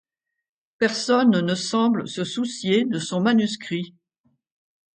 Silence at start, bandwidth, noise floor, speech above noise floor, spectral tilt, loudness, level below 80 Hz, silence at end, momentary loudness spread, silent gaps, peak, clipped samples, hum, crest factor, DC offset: 0.8 s; 9.4 kHz; -69 dBFS; 47 dB; -5 dB/octave; -22 LUFS; -70 dBFS; 1.05 s; 10 LU; none; -6 dBFS; under 0.1%; none; 18 dB; under 0.1%